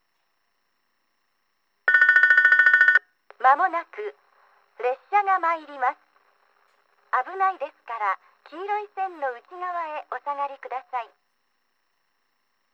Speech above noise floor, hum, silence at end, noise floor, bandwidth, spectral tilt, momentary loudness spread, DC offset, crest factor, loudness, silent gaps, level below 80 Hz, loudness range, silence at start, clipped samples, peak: 47 dB; none; 1.7 s; -74 dBFS; 8.2 kHz; 0 dB/octave; 19 LU; under 0.1%; 20 dB; -21 LUFS; none; under -90 dBFS; 13 LU; 1.85 s; under 0.1%; -4 dBFS